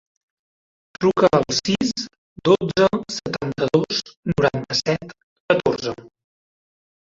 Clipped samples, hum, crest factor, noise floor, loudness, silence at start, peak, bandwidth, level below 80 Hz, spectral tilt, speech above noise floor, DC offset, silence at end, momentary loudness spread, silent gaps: under 0.1%; none; 20 dB; under -90 dBFS; -21 LUFS; 1 s; -2 dBFS; 7.8 kHz; -52 dBFS; -5 dB/octave; over 70 dB; under 0.1%; 1 s; 10 LU; 2.18-2.36 s, 4.17-4.23 s, 5.23-5.48 s